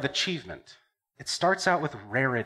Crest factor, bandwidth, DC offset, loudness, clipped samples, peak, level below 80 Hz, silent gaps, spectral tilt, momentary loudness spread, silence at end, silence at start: 18 dB; 14.5 kHz; under 0.1%; -27 LUFS; under 0.1%; -10 dBFS; -64 dBFS; none; -3.5 dB/octave; 16 LU; 0 s; 0 s